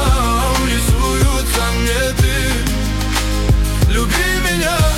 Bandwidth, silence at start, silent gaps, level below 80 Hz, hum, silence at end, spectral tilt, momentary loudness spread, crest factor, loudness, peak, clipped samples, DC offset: 16.5 kHz; 0 s; none; -18 dBFS; none; 0 s; -4 dB/octave; 3 LU; 12 dB; -16 LUFS; -2 dBFS; under 0.1%; under 0.1%